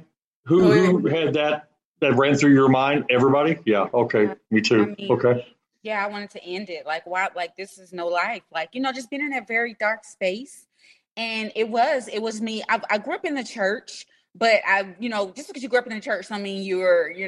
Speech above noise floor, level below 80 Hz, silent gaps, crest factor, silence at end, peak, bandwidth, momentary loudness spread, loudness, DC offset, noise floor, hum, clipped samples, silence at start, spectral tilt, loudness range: 36 dB; -66 dBFS; 1.85-1.94 s, 11.11-11.15 s; 18 dB; 0 s; -6 dBFS; 12 kHz; 14 LU; -22 LUFS; under 0.1%; -58 dBFS; none; under 0.1%; 0.45 s; -5.5 dB/octave; 8 LU